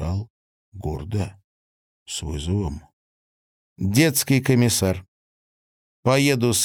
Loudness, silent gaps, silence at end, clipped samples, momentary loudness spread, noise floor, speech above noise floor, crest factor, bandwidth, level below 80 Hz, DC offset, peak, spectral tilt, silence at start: -22 LUFS; 0.30-0.72 s, 1.44-2.06 s, 2.93-3.76 s, 5.08-6.03 s; 0 s; under 0.1%; 14 LU; under -90 dBFS; over 69 dB; 18 dB; 18 kHz; -42 dBFS; under 0.1%; -6 dBFS; -4.5 dB/octave; 0 s